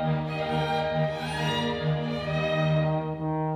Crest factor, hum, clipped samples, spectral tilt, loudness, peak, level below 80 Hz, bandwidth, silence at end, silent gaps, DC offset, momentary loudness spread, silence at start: 12 dB; none; under 0.1%; -7 dB/octave; -27 LUFS; -14 dBFS; -50 dBFS; 10 kHz; 0 s; none; under 0.1%; 4 LU; 0 s